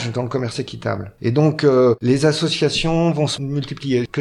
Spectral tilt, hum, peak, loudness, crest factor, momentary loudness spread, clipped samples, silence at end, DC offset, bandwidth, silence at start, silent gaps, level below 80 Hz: -6 dB/octave; none; -4 dBFS; -19 LUFS; 16 dB; 10 LU; under 0.1%; 0 s; under 0.1%; 11.5 kHz; 0 s; none; -44 dBFS